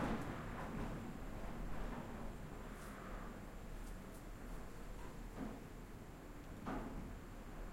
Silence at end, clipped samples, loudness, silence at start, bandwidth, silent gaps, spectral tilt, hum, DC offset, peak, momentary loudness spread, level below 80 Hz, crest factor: 0 s; under 0.1%; -50 LUFS; 0 s; 16.5 kHz; none; -6 dB/octave; none; under 0.1%; -30 dBFS; 7 LU; -52 dBFS; 18 dB